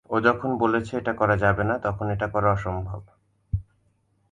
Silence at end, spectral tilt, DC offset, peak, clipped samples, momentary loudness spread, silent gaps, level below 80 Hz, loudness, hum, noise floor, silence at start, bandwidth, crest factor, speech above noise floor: 0.7 s; -8 dB/octave; under 0.1%; -6 dBFS; under 0.1%; 11 LU; none; -42 dBFS; -24 LUFS; none; -67 dBFS; 0.1 s; 9.4 kHz; 20 dB; 43 dB